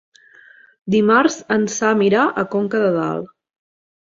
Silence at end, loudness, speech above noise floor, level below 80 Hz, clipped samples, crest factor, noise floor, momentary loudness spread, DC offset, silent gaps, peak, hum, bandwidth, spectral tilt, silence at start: 0.9 s; -17 LUFS; 31 dB; -60 dBFS; under 0.1%; 16 dB; -48 dBFS; 11 LU; under 0.1%; none; -2 dBFS; none; 7.6 kHz; -5 dB/octave; 0.85 s